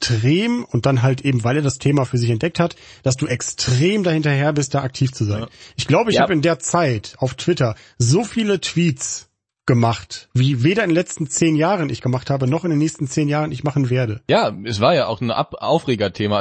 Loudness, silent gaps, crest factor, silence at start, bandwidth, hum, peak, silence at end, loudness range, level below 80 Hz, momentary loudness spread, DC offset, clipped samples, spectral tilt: -19 LUFS; none; 16 dB; 0 s; 8.8 kHz; none; -2 dBFS; 0 s; 1 LU; -50 dBFS; 6 LU; under 0.1%; under 0.1%; -5.5 dB/octave